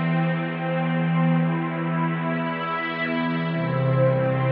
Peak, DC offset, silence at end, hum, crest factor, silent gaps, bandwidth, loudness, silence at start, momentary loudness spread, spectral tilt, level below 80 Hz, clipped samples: -10 dBFS; under 0.1%; 0 s; none; 14 dB; none; 4.8 kHz; -24 LUFS; 0 s; 5 LU; -6.5 dB/octave; -64 dBFS; under 0.1%